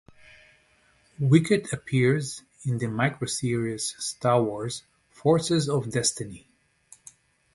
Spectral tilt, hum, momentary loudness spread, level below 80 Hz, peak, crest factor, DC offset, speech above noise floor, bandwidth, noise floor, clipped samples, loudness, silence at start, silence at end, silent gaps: -5 dB/octave; none; 13 LU; -60 dBFS; -6 dBFS; 20 dB; under 0.1%; 38 dB; 12 kHz; -63 dBFS; under 0.1%; -25 LUFS; 1.2 s; 1.15 s; none